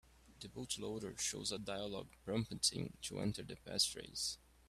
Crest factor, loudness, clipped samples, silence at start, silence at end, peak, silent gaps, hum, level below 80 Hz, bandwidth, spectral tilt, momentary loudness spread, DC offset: 22 dB; -41 LUFS; under 0.1%; 0.1 s; 0.3 s; -20 dBFS; none; none; -66 dBFS; 15.5 kHz; -3 dB/octave; 12 LU; under 0.1%